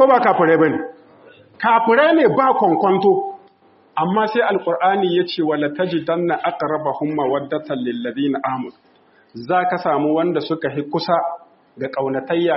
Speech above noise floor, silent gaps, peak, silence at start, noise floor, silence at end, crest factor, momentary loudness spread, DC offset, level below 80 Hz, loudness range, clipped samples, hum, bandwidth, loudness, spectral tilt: 35 dB; none; -2 dBFS; 0 s; -53 dBFS; 0 s; 16 dB; 11 LU; under 0.1%; -66 dBFS; 6 LU; under 0.1%; none; 5.8 kHz; -18 LUFS; -4 dB/octave